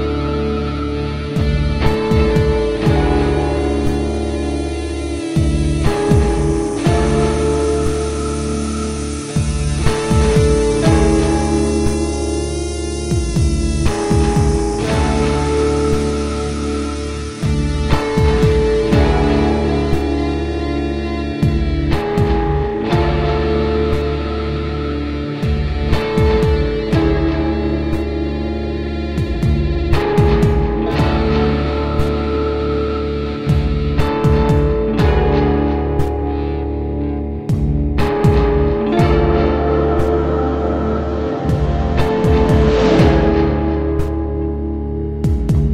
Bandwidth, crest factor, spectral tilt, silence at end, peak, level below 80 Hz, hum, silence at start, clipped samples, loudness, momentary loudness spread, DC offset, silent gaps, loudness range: 11.5 kHz; 16 dB; -7 dB/octave; 0 s; 0 dBFS; -20 dBFS; none; 0 s; under 0.1%; -17 LUFS; 7 LU; 0.5%; none; 3 LU